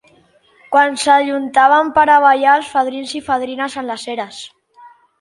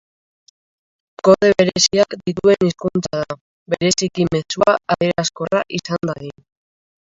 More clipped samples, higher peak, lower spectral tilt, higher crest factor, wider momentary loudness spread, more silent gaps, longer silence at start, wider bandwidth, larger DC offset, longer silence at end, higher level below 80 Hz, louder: neither; about the same, 0 dBFS vs 0 dBFS; second, -2.5 dB/octave vs -4 dB/octave; about the same, 16 dB vs 18 dB; about the same, 14 LU vs 12 LU; second, none vs 3.41-3.66 s; second, 0.7 s vs 1.25 s; first, 11.5 kHz vs 7.8 kHz; neither; second, 0.35 s vs 0.9 s; second, -58 dBFS vs -52 dBFS; first, -14 LUFS vs -17 LUFS